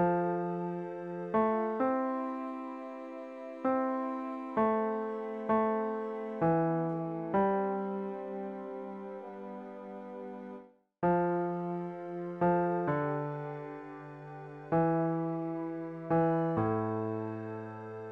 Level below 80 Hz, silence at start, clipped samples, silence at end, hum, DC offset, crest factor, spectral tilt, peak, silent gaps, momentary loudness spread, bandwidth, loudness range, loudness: -68 dBFS; 0 s; under 0.1%; 0 s; none; under 0.1%; 16 dB; -10.5 dB/octave; -18 dBFS; none; 14 LU; 4.9 kHz; 4 LU; -33 LUFS